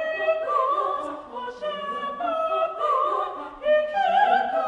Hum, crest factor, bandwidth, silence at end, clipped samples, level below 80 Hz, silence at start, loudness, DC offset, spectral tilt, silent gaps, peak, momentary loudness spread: none; 16 dB; 10 kHz; 0 s; under 0.1%; -62 dBFS; 0 s; -24 LUFS; under 0.1%; -4 dB/octave; none; -8 dBFS; 11 LU